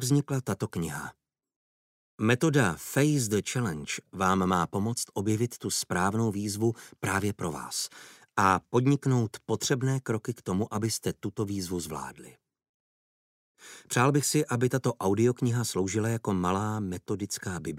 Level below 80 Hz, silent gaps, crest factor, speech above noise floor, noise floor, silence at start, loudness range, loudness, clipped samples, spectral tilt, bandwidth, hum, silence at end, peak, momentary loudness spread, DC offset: -62 dBFS; 1.56-2.18 s, 12.69-13.55 s; 20 dB; over 62 dB; under -90 dBFS; 0 s; 5 LU; -29 LUFS; under 0.1%; -5 dB/octave; 16 kHz; none; 0 s; -8 dBFS; 9 LU; under 0.1%